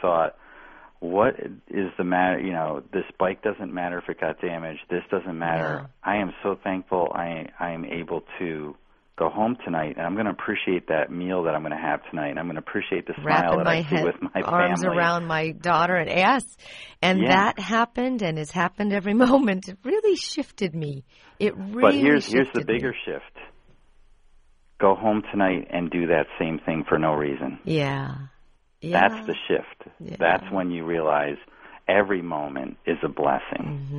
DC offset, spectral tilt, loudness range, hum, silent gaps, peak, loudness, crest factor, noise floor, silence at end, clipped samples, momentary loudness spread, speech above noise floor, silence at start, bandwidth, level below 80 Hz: under 0.1%; -6 dB/octave; 6 LU; none; none; -2 dBFS; -24 LUFS; 24 dB; -56 dBFS; 0 s; under 0.1%; 11 LU; 32 dB; 0 s; 10.5 kHz; -54 dBFS